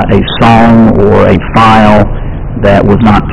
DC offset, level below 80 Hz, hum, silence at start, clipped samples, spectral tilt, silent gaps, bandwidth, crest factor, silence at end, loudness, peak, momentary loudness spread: under 0.1%; -18 dBFS; none; 0 s; 10%; -8 dB/octave; none; 10 kHz; 6 dB; 0 s; -5 LUFS; 0 dBFS; 8 LU